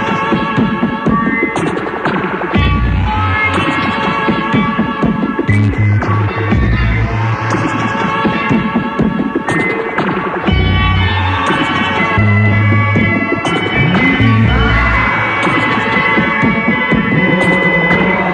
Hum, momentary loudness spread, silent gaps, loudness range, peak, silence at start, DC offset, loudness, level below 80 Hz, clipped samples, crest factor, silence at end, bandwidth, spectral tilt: none; 5 LU; none; 3 LU; 0 dBFS; 0 s; under 0.1%; -13 LUFS; -24 dBFS; under 0.1%; 12 dB; 0 s; 9.6 kHz; -7 dB/octave